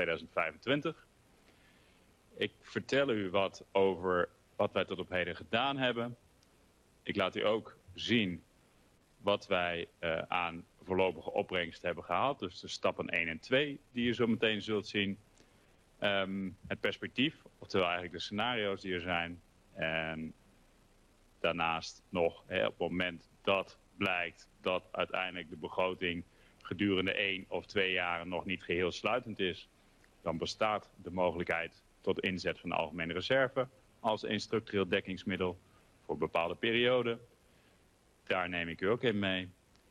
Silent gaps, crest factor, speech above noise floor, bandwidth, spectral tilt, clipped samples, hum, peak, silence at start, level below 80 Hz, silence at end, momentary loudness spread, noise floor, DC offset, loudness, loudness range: none; 20 dB; 33 dB; 12.5 kHz; -5 dB/octave; under 0.1%; none; -16 dBFS; 0 s; -68 dBFS; 0.4 s; 9 LU; -67 dBFS; under 0.1%; -35 LUFS; 3 LU